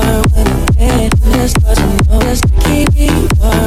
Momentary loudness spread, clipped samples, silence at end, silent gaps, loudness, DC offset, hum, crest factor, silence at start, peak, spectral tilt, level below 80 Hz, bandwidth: 1 LU; under 0.1%; 0 s; none; -11 LUFS; under 0.1%; none; 8 dB; 0 s; 0 dBFS; -5.5 dB/octave; -12 dBFS; 16 kHz